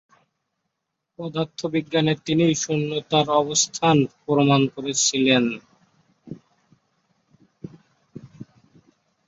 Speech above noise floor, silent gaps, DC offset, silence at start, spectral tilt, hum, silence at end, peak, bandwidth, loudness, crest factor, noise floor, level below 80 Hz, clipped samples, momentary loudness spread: 59 dB; none; under 0.1%; 1.2 s; -4 dB/octave; none; 0.85 s; -6 dBFS; 8.2 kHz; -21 LUFS; 18 dB; -80 dBFS; -64 dBFS; under 0.1%; 24 LU